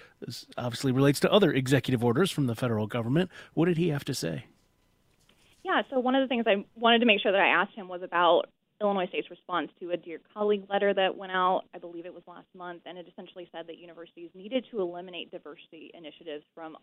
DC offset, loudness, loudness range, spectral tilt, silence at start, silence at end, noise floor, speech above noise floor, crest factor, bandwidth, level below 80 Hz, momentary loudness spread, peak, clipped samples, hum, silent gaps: under 0.1%; -27 LUFS; 13 LU; -5.5 dB/octave; 0.2 s; 0.05 s; -68 dBFS; 40 dB; 22 dB; 16 kHz; -66 dBFS; 22 LU; -6 dBFS; under 0.1%; none; none